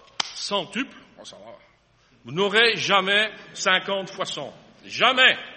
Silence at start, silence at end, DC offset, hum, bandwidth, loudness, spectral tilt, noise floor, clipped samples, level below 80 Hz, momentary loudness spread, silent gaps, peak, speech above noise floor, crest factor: 0.2 s; 0 s; under 0.1%; none; 8.8 kHz; -21 LUFS; -2 dB/octave; -60 dBFS; under 0.1%; -70 dBFS; 17 LU; none; -2 dBFS; 37 dB; 22 dB